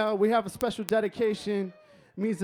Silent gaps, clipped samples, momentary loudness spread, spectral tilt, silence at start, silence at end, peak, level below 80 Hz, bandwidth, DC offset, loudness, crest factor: none; under 0.1%; 9 LU; -5.5 dB/octave; 0 s; 0 s; -6 dBFS; -64 dBFS; over 20 kHz; under 0.1%; -28 LUFS; 22 dB